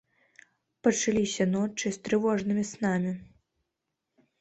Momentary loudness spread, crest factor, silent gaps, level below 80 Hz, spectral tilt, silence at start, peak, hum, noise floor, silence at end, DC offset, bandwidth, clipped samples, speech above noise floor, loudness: 5 LU; 20 dB; none; -64 dBFS; -5 dB/octave; 0.85 s; -10 dBFS; none; -84 dBFS; 1.15 s; under 0.1%; 8.4 kHz; under 0.1%; 57 dB; -28 LUFS